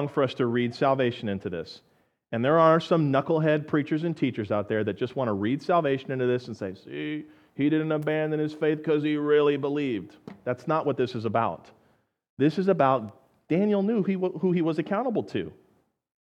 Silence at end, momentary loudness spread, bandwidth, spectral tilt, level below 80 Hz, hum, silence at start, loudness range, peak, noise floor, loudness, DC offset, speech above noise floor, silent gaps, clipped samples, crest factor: 0.7 s; 12 LU; 8.6 kHz; -8 dB/octave; -72 dBFS; none; 0 s; 3 LU; -6 dBFS; -67 dBFS; -26 LUFS; under 0.1%; 41 dB; 12.29-12.37 s; under 0.1%; 20 dB